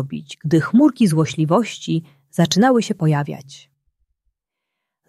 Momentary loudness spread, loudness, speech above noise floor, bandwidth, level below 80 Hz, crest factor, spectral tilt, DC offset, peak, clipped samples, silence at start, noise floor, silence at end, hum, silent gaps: 14 LU; -18 LUFS; 63 dB; 13 kHz; -62 dBFS; 16 dB; -6 dB/octave; under 0.1%; -2 dBFS; under 0.1%; 0 s; -81 dBFS; 1.5 s; none; none